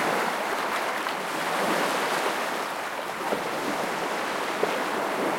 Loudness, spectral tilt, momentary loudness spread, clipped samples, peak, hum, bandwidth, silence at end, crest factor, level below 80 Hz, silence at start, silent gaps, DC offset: -27 LUFS; -2.5 dB/octave; 4 LU; under 0.1%; -10 dBFS; none; 16.5 kHz; 0 s; 18 dB; -70 dBFS; 0 s; none; under 0.1%